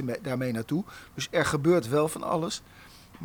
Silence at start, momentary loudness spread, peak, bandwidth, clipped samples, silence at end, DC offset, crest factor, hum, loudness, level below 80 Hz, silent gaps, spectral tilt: 0 s; 11 LU; -12 dBFS; over 20 kHz; under 0.1%; 0 s; under 0.1%; 16 dB; none; -28 LUFS; -58 dBFS; none; -5.5 dB/octave